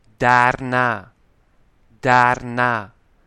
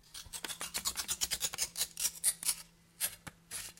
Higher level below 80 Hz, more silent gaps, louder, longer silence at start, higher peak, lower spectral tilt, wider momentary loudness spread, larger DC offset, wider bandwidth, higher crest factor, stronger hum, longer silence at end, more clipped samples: first, -50 dBFS vs -64 dBFS; neither; first, -18 LUFS vs -35 LUFS; first, 0.2 s vs 0.05 s; first, 0 dBFS vs -12 dBFS; first, -5.5 dB/octave vs 1 dB/octave; about the same, 10 LU vs 12 LU; neither; second, 11 kHz vs 17 kHz; second, 20 dB vs 26 dB; neither; first, 0.4 s vs 0.05 s; neither